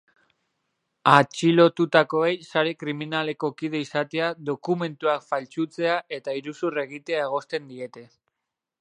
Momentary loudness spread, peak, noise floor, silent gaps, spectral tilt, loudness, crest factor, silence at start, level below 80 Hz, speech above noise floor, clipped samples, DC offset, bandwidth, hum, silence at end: 13 LU; 0 dBFS; -85 dBFS; none; -5.5 dB/octave; -24 LUFS; 24 dB; 1.05 s; -76 dBFS; 61 dB; under 0.1%; under 0.1%; 10.5 kHz; none; 0.75 s